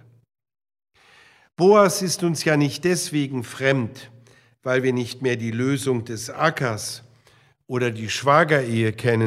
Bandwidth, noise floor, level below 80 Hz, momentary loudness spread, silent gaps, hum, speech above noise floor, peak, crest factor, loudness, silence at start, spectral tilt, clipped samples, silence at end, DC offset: 15.5 kHz; -57 dBFS; -66 dBFS; 12 LU; none; none; 36 dB; -2 dBFS; 20 dB; -21 LUFS; 1.6 s; -5 dB/octave; under 0.1%; 0 s; under 0.1%